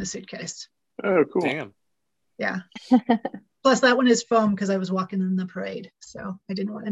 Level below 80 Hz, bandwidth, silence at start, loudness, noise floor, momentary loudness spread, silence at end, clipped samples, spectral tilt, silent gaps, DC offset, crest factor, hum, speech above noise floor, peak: -64 dBFS; 8.2 kHz; 0 s; -24 LUFS; -80 dBFS; 17 LU; 0 s; under 0.1%; -5 dB/octave; none; under 0.1%; 20 dB; none; 57 dB; -6 dBFS